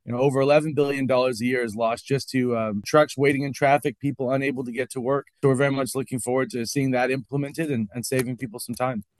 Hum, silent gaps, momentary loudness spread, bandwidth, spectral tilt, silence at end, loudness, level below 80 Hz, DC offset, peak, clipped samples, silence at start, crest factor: none; none; 8 LU; 13 kHz; -5.5 dB/octave; 0.15 s; -24 LUFS; -64 dBFS; under 0.1%; -4 dBFS; under 0.1%; 0.05 s; 18 dB